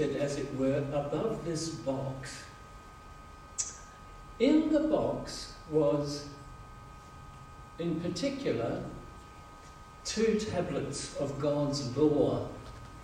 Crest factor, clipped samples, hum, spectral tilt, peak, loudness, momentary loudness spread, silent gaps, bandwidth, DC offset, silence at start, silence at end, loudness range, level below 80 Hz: 18 dB; under 0.1%; none; -5.5 dB/octave; -14 dBFS; -32 LUFS; 22 LU; none; 12.5 kHz; under 0.1%; 0 s; 0 s; 6 LU; -54 dBFS